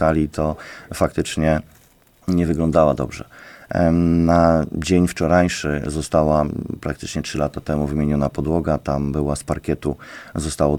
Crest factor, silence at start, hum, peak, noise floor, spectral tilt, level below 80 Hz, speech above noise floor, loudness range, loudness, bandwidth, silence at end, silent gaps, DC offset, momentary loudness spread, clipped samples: 18 dB; 0 s; none; -2 dBFS; -53 dBFS; -6.5 dB/octave; -34 dBFS; 34 dB; 4 LU; -20 LUFS; 16 kHz; 0 s; none; under 0.1%; 11 LU; under 0.1%